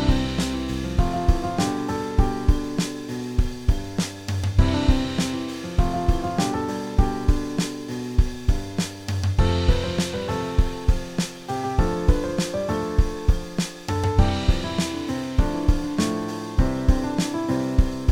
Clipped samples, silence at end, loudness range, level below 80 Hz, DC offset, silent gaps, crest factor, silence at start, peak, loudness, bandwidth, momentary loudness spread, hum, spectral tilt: under 0.1%; 0 s; 1 LU; -26 dBFS; under 0.1%; none; 18 dB; 0 s; -4 dBFS; -24 LUFS; 16 kHz; 6 LU; none; -6 dB/octave